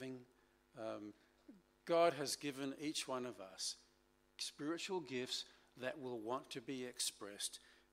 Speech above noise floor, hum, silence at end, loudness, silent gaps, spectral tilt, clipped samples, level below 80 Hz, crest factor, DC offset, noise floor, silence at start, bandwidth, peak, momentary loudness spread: 32 dB; none; 0.2 s; -43 LUFS; none; -3 dB/octave; under 0.1%; -82 dBFS; 24 dB; under 0.1%; -75 dBFS; 0 s; 15.5 kHz; -22 dBFS; 17 LU